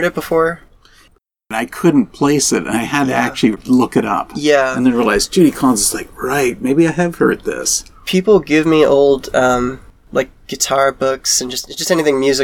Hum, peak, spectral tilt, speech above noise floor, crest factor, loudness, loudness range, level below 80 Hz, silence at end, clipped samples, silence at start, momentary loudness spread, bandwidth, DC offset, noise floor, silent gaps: none; 0 dBFS; -4 dB/octave; 38 dB; 14 dB; -15 LUFS; 2 LU; -42 dBFS; 0 s; under 0.1%; 0 s; 8 LU; 19 kHz; 0.2%; -53 dBFS; none